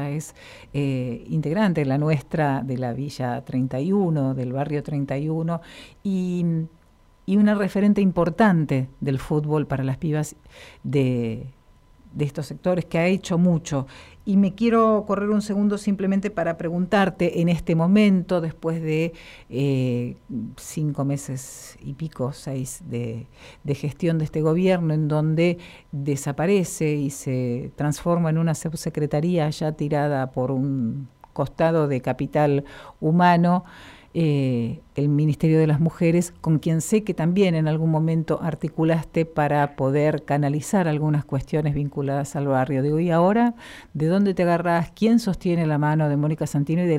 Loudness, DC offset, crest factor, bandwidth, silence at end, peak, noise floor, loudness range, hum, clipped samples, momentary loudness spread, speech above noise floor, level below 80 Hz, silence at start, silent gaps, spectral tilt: -23 LUFS; under 0.1%; 16 dB; 15 kHz; 0 s; -6 dBFS; -53 dBFS; 5 LU; none; under 0.1%; 11 LU; 31 dB; -50 dBFS; 0 s; none; -7.5 dB/octave